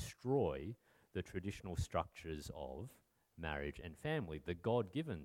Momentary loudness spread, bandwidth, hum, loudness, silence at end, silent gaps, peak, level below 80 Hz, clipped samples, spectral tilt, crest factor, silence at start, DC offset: 11 LU; 17.5 kHz; none; -43 LUFS; 0 s; none; -24 dBFS; -58 dBFS; under 0.1%; -6.5 dB/octave; 20 dB; 0 s; under 0.1%